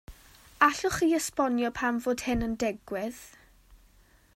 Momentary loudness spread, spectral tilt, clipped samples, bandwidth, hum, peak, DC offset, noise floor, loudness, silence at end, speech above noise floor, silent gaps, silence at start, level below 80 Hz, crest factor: 11 LU; -4 dB/octave; under 0.1%; 16 kHz; none; -6 dBFS; under 0.1%; -60 dBFS; -28 LUFS; 0.6 s; 32 dB; none; 0.1 s; -50 dBFS; 24 dB